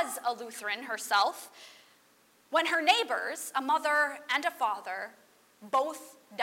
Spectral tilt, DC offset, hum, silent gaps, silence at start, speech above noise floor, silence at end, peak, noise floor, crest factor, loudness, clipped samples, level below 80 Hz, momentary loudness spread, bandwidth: 0 dB/octave; under 0.1%; none; none; 0 s; 34 dB; 0 s; -8 dBFS; -64 dBFS; 24 dB; -30 LUFS; under 0.1%; -90 dBFS; 18 LU; 16 kHz